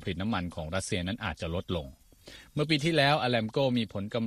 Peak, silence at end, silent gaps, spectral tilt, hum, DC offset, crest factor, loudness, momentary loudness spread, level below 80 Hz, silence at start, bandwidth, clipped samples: -10 dBFS; 0 s; none; -5.5 dB/octave; none; under 0.1%; 20 dB; -30 LUFS; 12 LU; -52 dBFS; 0 s; 14.5 kHz; under 0.1%